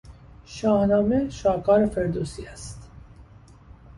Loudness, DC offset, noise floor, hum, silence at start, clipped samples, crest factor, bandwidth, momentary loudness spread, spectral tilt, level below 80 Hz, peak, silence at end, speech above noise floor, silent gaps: -23 LUFS; under 0.1%; -49 dBFS; none; 0.1 s; under 0.1%; 16 dB; 11.5 kHz; 20 LU; -7 dB/octave; -44 dBFS; -8 dBFS; 0.75 s; 26 dB; none